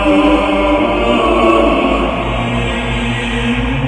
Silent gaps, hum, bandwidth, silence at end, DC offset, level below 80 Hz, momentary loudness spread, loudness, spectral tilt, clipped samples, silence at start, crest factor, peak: none; none; 11 kHz; 0 s; under 0.1%; -24 dBFS; 6 LU; -13 LUFS; -6 dB/octave; under 0.1%; 0 s; 12 dB; 0 dBFS